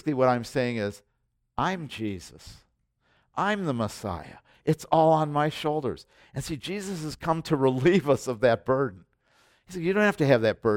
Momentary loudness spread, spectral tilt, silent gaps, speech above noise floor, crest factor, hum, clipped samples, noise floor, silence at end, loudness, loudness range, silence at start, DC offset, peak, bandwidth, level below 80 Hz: 14 LU; -6 dB/octave; none; 45 dB; 20 dB; none; under 0.1%; -70 dBFS; 0 s; -26 LUFS; 7 LU; 0.05 s; under 0.1%; -6 dBFS; 16.5 kHz; -56 dBFS